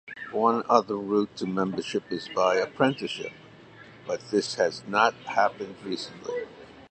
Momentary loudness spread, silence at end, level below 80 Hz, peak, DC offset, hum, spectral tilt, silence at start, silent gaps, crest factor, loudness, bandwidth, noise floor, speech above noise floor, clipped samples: 11 LU; 0.05 s; -68 dBFS; -4 dBFS; under 0.1%; none; -4.5 dB/octave; 0.05 s; none; 22 dB; -27 LUFS; 9 kHz; -49 dBFS; 23 dB; under 0.1%